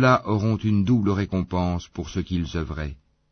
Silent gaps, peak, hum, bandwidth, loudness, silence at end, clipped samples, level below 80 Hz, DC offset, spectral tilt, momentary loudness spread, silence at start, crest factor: none; -4 dBFS; none; 6.6 kHz; -24 LUFS; 0.35 s; under 0.1%; -40 dBFS; under 0.1%; -7.5 dB/octave; 10 LU; 0 s; 18 dB